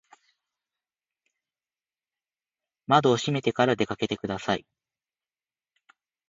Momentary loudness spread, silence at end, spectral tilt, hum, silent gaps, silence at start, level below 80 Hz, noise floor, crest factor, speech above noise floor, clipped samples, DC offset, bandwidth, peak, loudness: 9 LU; 1.7 s; -5.5 dB/octave; none; none; 2.9 s; -64 dBFS; under -90 dBFS; 24 dB; over 65 dB; under 0.1%; under 0.1%; 8 kHz; -6 dBFS; -25 LUFS